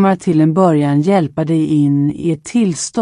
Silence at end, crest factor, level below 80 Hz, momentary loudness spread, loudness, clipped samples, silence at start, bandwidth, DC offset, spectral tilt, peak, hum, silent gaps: 0 s; 12 dB; -52 dBFS; 5 LU; -14 LUFS; under 0.1%; 0 s; 11 kHz; under 0.1%; -7 dB/octave; -2 dBFS; none; none